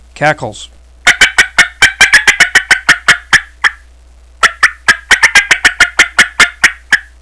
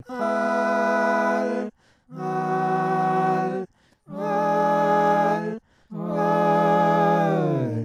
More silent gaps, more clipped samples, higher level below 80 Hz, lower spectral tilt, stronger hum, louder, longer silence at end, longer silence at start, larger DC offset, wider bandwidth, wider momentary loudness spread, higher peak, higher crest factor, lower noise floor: neither; first, 3% vs under 0.1%; first, -36 dBFS vs -72 dBFS; second, 0 dB/octave vs -7.5 dB/octave; neither; first, -7 LUFS vs -22 LUFS; first, 0.2 s vs 0 s; about the same, 0.2 s vs 0.1 s; first, 0.4% vs under 0.1%; second, 11 kHz vs 13.5 kHz; second, 8 LU vs 13 LU; first, 0 dBFS vs -10 dBFS; about the same, 10 dB vs 14 dB; second, -39 dBFS vs -44 dBFS